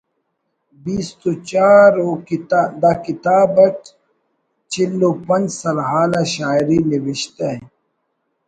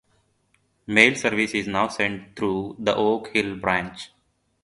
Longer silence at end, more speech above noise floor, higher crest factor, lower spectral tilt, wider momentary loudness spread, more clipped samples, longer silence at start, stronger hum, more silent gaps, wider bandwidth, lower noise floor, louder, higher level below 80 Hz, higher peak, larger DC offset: first, 0.8 s vs 0.55 s; first, 55 dB vs 46 dB; second, 16 dB vs 24 dB; first, -5.5 dB/octave vs -4 dB/octave; about the same, 13 LU vs 11 LU; neither; about the same, 0.85 s vs 0.9 s; neither; neither; second, 9.4 kHz vs 11.5 kHz; about the same, -71 dBFS vs -69 dBFS; first, -16 LUFS vs -22 LUFS; about the same, -54 dBFS vs -56 dBFS; about the same, 0 dBFS vs 0 dBFS; neither